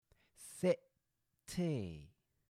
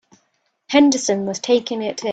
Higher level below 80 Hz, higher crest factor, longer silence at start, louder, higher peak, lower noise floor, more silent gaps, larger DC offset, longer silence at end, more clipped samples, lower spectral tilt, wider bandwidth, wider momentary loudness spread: second, -70 dBFS vs -64 dBFS; about the same, 22 dB vs 18 dB; second, 0.4 s vs 0.7 s; second, -40 LUFS vs -18 LUFS; second, -20 dBFS vs 0 dBFS; first, -84 dBFS vs -68 dBFS; neither; neither; first, 0.45 s vs 0 s; neither; first, -6.5 dB/octave vs -3.5 dB/octave; first, 15.5 kHz vs 9 kHz; first, 19 LU vs 9 LU